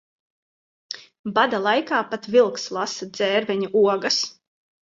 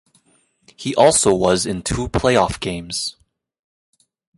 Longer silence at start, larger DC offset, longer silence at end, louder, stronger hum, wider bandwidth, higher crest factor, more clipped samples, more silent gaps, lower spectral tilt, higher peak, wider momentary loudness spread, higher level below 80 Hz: about the same, 0.9 s vs 0.8 s; neither; second, 0.65 s vs 1.25 s; second, -21 LUFS vs -18 LUFS; neither; second, 7.8 kHz vs 11.5 kHz; about the same, 18 dB vs 18 dB; neither; first, 1.19-1.24 s vs none; about the same, -3 dB/octave vs -3.5 dB/octave; second, -6 dBFS vs -2 dBFS; about the same, 12 LU vs 12 LU; second, -72 dBFS vs -40 dBFS